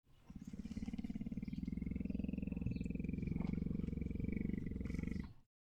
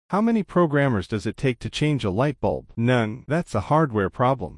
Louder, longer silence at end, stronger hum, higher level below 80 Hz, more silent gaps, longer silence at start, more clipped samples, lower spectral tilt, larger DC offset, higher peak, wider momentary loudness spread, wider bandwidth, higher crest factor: second, -44 LUFS vs -23 LUFS; first, 0.2 s vs 0 s; neither; about the same, -50 dBFS vs -48 dBFS; neither; about the same, 0.1 s vs 0.1 s; neither; first, -9 dB/octave vs -7 dB/octave; neither; second, -26 dBFS vs -6 dBFS; about the same, 7 LU vs 6 LU; second, 8.8 kHz vs 11.5 kHz; about the same, 16 dB vs 16 dB